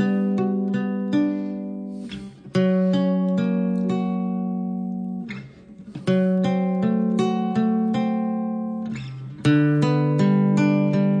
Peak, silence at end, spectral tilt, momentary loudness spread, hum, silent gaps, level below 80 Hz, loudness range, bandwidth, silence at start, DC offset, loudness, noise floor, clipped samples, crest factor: -8 dBFS; 0 s; -8.5 dB/octave; 13 LU; none; none; -60 dBFS; 3 LU; 9.4 kHz; 0 s; under 0.1%; -22 LUFS; -42 dBFS; under 0.1%; 14 dB